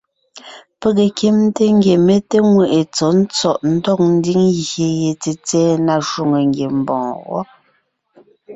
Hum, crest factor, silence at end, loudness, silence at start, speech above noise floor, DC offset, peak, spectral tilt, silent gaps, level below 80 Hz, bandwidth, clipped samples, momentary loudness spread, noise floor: none; 12 dB; 0 s; -15 LUFS; 0.35 s; 47 dB; under 0.1%; -2 dBFS; -6 dB/octave; none; -54 dBFS; 8 kHz; under 0.1%; 9 LU; -62 dBFS